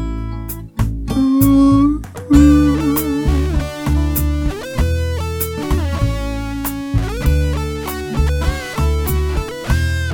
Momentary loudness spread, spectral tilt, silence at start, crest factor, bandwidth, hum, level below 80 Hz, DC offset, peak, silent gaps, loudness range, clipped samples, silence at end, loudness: 12 LU; -6.5 dB/octave; 0 s; 16 dB; 19 kHz; none; -20 dBFS; under 0.1%; 0 dBFS; none; 6 LU; under 0.1%; 0 s; -17 LUFS